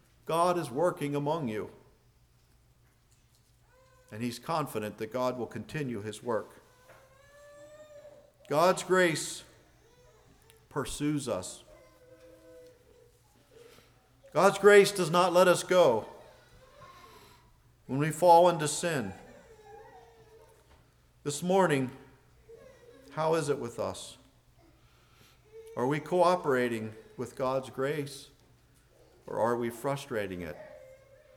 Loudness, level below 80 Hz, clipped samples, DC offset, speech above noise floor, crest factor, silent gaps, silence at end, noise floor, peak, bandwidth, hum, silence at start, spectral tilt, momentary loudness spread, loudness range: -29 LUFS; -64 dBFS; under 0.1%; under 0.1%; 37 dB; 22 dB; none; 0.4 s; -65 dBFS; -8 dBFS; 18.5 kHz; none; 0.25 s; -4.5 dB/octave; 20 LU; 13 LU